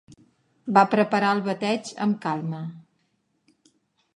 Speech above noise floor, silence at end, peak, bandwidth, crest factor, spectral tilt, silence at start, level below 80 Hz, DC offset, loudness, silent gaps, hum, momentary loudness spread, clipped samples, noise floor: 48 dB; 1.35 s; -2 dBFS; 10.5 kHz; 24 dB; -6 dB/octave; 0.65 s; -74 dBFS; under 0.1%; -23 LUFS; none; none; 15 LU; under 0.1%; -71 dBFS